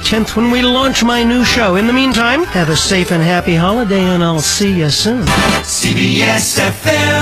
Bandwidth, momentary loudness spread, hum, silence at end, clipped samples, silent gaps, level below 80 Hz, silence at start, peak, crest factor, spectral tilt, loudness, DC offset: 16 kHz; 2 LU; none; 0 s; under 0.1%; none; -30 dBFS; 0 s; -2 dBFS; 10 dB; -4 dB/octave; -12 LUFS; 0.4%